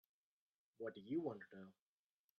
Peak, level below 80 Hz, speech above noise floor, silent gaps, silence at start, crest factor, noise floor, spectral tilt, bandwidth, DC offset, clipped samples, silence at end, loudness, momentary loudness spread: -32 dBFS; under -90 dBFS; over 42 dB; none; 0.8 s; 20 dB; under -90 dBFS; -6.5 dB/octave; 6.4 kHz; under 0.1%; under 0.1%; 0.65 s; -48 LUFS; 16 LU